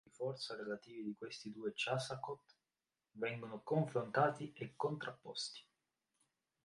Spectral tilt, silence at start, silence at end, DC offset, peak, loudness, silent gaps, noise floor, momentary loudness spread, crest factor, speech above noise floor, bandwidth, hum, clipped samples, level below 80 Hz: -5 dB/octave; 0.2 s; 1.05 s; under 0.1%; -20 dBFS; -42 LUFS; none; under -90 dBFS; 12 LU; 24 dB; over 48 dB; 11.5 kHz; none; under 0.1%; -84 dBFS